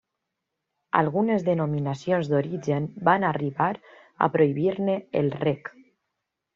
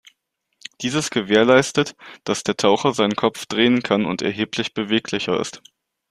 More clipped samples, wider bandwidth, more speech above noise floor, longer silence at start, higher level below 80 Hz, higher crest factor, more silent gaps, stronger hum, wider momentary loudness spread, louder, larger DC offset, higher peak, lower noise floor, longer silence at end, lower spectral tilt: neither; second, 7.4 kHz vs 13.5 kHz; first, 58 dB vs 53 dB; first, 0.95 s vs 0.8 s; second, -66 dBFS vs -58 dBFS; about the same, 22 dB vs 20 dB; neither; neither; second, 6 LU vs 11 LU; second, -25 LUFS vs -20 LUFS; neither; about the same, -4 dBFS vs -2 dBFS; first, -82 dBFS vs -73 dBFS; first, 0.85 s vs 0.5 s; first, -6.5 dB/octave vs -4 dB/octave